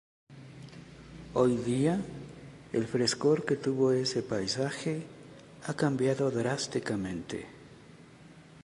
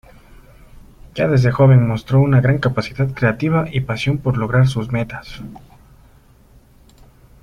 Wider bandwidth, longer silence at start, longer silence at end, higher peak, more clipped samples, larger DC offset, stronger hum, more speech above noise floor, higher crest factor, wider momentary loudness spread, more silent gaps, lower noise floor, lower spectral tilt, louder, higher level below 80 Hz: first, 11.5 kHz vs 9.4 kHz; second, 0.3 s vs 0.75 s; second, 0 s vs 1.85 s; second, -12 dBFS vs -2 dBFS; neither; neither; neither; second, 24 dB vs 33 dB; about the same, 20 dB vs 16 dB; first, 21 LU vs 17 LU; neither; first, -53 dBFS vs -48 dBFS; second, -5.5 dB/octave vs -8 dB/octave; second, -30 LUFS vs -17 LUFS; second, -62 dBFS vs -42 dBFS